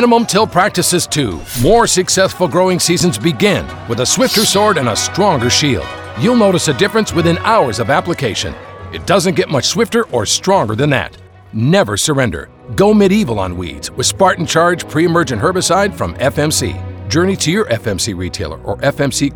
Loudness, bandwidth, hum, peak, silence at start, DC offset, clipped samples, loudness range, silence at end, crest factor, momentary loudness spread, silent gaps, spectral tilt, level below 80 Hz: -13 LUFS; over 20 kHz; none; 0 dBFS; 0 s; under 0.1%; under 0.1%; 2 LU; 0 s; 14 dB; 10 LU; none; -4 dB/octave; -38 dBFS